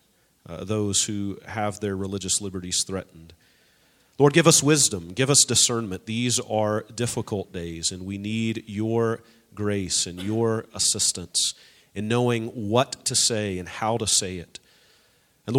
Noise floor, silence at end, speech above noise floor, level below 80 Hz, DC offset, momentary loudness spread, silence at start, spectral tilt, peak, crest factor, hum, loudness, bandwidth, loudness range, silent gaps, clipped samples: -62 dBFS; 0 s; 38 dB; -58 dBFS; under 0.1%; 14 LU; 0.5 s; -3 dB/octave; 0 dBFS; 24 dB; none; -23 LUFS; 16.5 kHz; 7 LU; none; under 0.1%